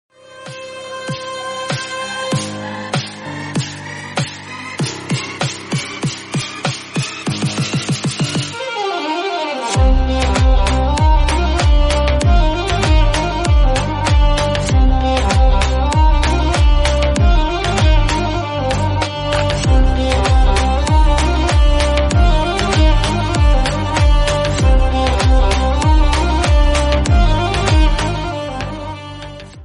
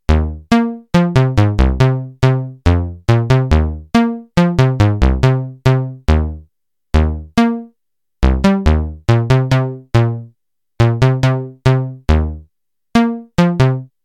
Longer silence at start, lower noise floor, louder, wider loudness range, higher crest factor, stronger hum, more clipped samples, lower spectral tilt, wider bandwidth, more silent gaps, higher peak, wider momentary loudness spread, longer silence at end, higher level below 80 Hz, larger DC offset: first, 0.3 s vs 0.1 s; second, -34 dBFS vs -76 dBFS; about the same, -16 LUFS vs -15 LUFS; first, 8 LU vs 2 LU; about the same, 12 dB vs 14 dB; neither; neither; second, -5 dB/octave vs -7.5 dB/octave; first, 11.5 kHz vs 9.8 kHz; neither; about the same, -2 dBFS vs 0 dBFS; first, 10 LU vs 4 LU; second, 0 s vs 0.2 s; first, -16 dBFS vs -22 dBFS; second, under 0.1% vs 0.4%